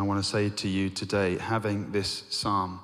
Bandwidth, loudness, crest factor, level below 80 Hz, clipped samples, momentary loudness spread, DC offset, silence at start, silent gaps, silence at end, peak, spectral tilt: 14.5 kHz; -28 LUFS; 14 dB; -60 dBFS; under 0.1%; 3 LU; under 0.1%; 0 s; none; 0 s; -14 dBFS; -5 dB/octave